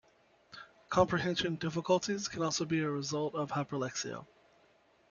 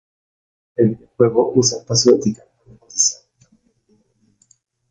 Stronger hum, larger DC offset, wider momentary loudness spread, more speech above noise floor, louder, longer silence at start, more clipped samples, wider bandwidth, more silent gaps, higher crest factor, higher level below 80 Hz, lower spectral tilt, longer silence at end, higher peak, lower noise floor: neither; neither; first, 18 LU vs 15 LU; second, 34 dB vs 45 dB; second, -33 LUFS vs -17 LUFS; second, 0.5 s vs 0.8 s; neither; second, 7.4 kHz vs 9.6 kHz; neither; about the same, 22 dB vs 18 dB; second, -64 dBFS vs -56 dBFS; about the same, -4.5 dB/octave vs -4.5 dB/octave; second, 0.85 s vs 1.75 s; second, -14 dBFS vs -2 dBFS; first, -67 dBFS vs -61 dBFS